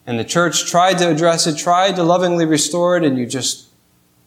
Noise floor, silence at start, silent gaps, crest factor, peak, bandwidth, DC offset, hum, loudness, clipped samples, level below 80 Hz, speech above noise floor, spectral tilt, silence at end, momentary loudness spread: -56 dBFS; 0.05 s; none; 14 dB; -2 dBFS; 16 kHz; under 0.1%; 60 Hz at -45 dBFS; -15 LUFS; under 0.1%; -64 dBFS; 41 dB; -3.5 dB/octave; 0.65 s; 5 LU